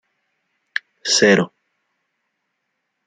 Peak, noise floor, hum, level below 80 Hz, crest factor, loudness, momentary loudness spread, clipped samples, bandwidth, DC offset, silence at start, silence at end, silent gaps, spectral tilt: -2 dBFS; -75 dBFS; none; -66 dBFS; 20 dB; -18 LUFS; 15 LU; under 0.1%; 10.5 kHz; under 0.1%; 1.05 s; 1.6 s; none; -3 dB/octave